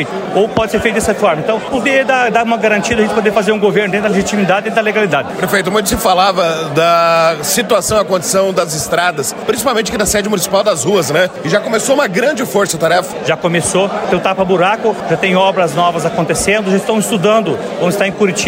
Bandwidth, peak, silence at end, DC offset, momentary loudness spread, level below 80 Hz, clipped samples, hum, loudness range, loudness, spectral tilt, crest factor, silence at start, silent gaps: 16.5 kHz; 0 dBFS; 0 s; under 0.1%; 4 LU; -40 dBFS; under 0.1%; none; 1 LU; -13 LUFS; -4 dB/octave; 12 dB; 0 s; none